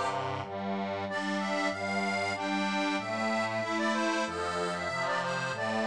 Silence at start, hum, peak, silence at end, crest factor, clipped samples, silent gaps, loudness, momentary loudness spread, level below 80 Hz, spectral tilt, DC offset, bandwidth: 0 s; none; -18 dBFS; 0 s; 14 dB; under 0.1%; none; -31 LUFS; 4 LU; -68 dBFS; -4.5 dB/octave; under 0.1%; 10.5 kHz